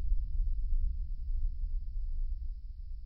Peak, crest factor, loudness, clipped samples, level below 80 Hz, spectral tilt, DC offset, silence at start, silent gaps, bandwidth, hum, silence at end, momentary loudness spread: -18 dBFS; 14 dB; -40 LUFS; under 0.1%; -32 dBFS; -10 dB/octave; under 0.1%; 0 s; none; 0.3 kHz; none; 0 s; 7 LU